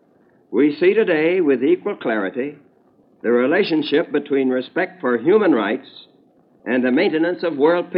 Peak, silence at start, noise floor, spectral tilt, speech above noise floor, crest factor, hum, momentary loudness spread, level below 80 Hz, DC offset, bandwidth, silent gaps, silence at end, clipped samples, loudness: -4 dBFS; 0.5 s; -56 dBFS; -9.5 dB/octave; 38 dB; 14 dB; none; 9 LU; -78 dBFS; under 0.1%; 5.6 kHz; none; 0 s; under 0.1%; -18 LUFS